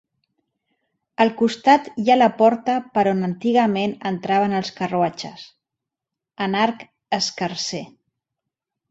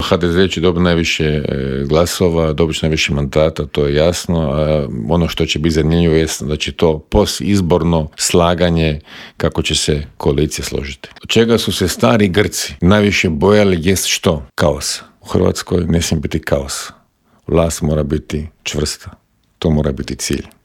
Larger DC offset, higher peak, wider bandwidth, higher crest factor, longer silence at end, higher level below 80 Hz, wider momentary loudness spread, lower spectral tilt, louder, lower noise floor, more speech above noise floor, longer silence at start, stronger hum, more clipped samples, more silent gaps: neither; about the same, -2 dBFS vs 0 dBFS; second, 8 kHz vs 16.5 kHz; about the same, 18 dB vs 14 dB; first, 1.05 s vs 0.15 s; second, -64 dBFS vs -32 dBFS; first, 11 LU vs 8 LU; about the same, -5 dB/octave vs -5 dB/octave; second, -20 LUFS vs -15 LUFS; first, -86 dBFS vs -54 dBFS; first, 66 dB vs 40 dB; first, 1.2 s vs 0 s; neither; neither; neither